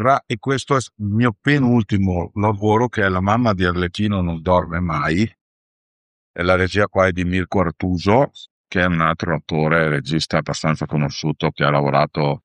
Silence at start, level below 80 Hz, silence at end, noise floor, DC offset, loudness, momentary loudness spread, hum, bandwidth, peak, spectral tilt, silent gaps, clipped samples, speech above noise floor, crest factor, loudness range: 0 s; -42 dBFS; 0.05 s; under -90 dBFS; under 0.1%; -19 LUFS; 5 LU; none; 10.5 kHz; -2 dBFS; -6.5 dB/octave; 5.41-6.34 s, 8.51-8.64 s; under 0.1%; over 72 dB; 18 dB; 2 LU